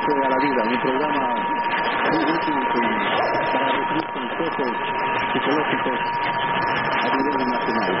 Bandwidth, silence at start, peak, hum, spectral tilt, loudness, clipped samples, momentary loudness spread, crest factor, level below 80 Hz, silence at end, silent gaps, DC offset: 5.8 kHz; 0 s; -8 dBFS; none; -9 dB/octave; -21 LUFS; under 0.1%; 3 LU; 14 dB; -54 dBFS; 0 s; none; 0.3%